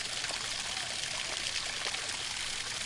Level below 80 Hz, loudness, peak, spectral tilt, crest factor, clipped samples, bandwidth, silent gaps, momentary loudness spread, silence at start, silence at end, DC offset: -58 dBFS; -33 LUFS; -16 dBFS; 0.5 dB/octave; 20 dB; under 0.1%; 11.5 kHz; none; 1 LU; 0 s; 0 s; under 0.1%